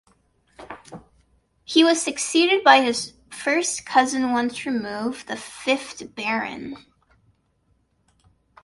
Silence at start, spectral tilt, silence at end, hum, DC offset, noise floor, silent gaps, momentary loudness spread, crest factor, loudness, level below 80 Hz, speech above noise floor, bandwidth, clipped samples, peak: 0.6 s; -2 dB/octave; 1.85 s; none; under 0.1%; -66 dBFS; none; 20 LU; 22 dB; -21 LUFS; -64 dBFS; 45 dB; 11.5 kHz; under 0.1%; 0 dBFS